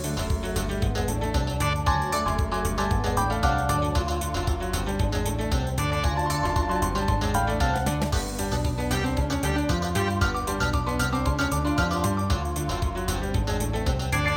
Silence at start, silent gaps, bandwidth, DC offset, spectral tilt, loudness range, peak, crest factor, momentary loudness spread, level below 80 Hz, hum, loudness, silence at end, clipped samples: 0 s; none; 18.5 kHz; under 0.1%; -5 dB/octave; 1 LU; -8 dBFS; 16 dB; 4 LU; -30 dBFS; none; -26 LUFS; 0 s; under 0.1%